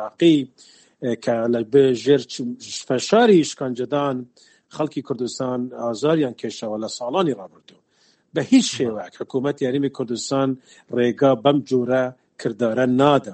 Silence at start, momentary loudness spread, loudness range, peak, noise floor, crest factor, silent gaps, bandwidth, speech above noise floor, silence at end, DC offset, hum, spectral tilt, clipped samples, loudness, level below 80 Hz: 0 s; 12 LU; 5 LU; -2 dBFS; -61 dBFS; 20 dB; none; 8.8 kHz; 41 dB; 0 s; under 0.1%; none; -5.5 dB/octave; under 0.1%; -21 LUFS; -66 dBFS